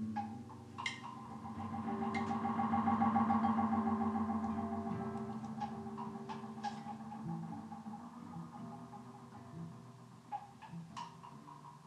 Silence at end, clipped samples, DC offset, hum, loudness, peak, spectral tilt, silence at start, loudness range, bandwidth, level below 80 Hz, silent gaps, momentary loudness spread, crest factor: 0 s; under 0.1%; under 0.1%; none; -40 LUFS; -22 dBFS; -7 dB/octave; 0 s; 15 LU; 10 kHz; -72 dBFS; none; 19 LU; 18 dB